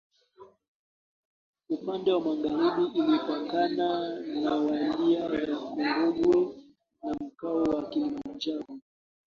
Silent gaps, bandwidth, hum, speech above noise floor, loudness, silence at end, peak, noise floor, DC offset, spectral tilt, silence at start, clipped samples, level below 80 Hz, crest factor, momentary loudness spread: 0.68-1.53 s; 7 kHz; none; 28 dB; -28 LUFS; 0.45 s; -14 dBFS; -55 dBFS; under 0.1%; -6.5 dB/octave; 0.4 s; under 0.1%; -64 dBFS; 16 dB; 10 LU